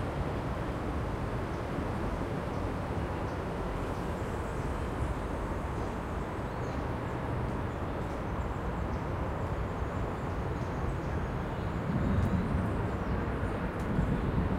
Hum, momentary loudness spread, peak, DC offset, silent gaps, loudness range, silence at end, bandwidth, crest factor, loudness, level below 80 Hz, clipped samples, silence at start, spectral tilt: none; 4 LU; -18 dBFS; under 0.1%; none; 3 LU; 0 s; 15.5 kHz; 14 dB; -34 LUFS; -40 dBFS; under 0.1%; 0 s; -7.5 dB/octave